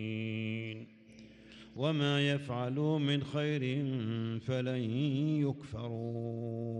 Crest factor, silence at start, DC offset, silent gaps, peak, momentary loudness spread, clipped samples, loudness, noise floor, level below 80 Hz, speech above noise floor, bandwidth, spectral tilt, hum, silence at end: 16 dB; 0 s; under 0.1%; none; -20 dBFS; 10 LU; under 0.1%; -34 LUFS; -56 dBFS; -68 dBFS; 22 dB; 9.4 kHz; -7 dB/octave; none; 0 s